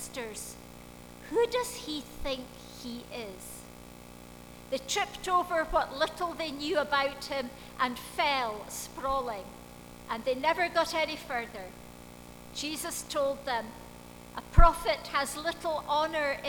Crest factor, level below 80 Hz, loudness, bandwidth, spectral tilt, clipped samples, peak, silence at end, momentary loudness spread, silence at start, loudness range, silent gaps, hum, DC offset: 26 dB; -38 dBFS; -31 LUFS; over 20 kHz; -3.5 dB/octave; under 0.1%; -6 dBFS; 0 s; 20 LU; 0 s; 5 LU; none; none; under 0.1%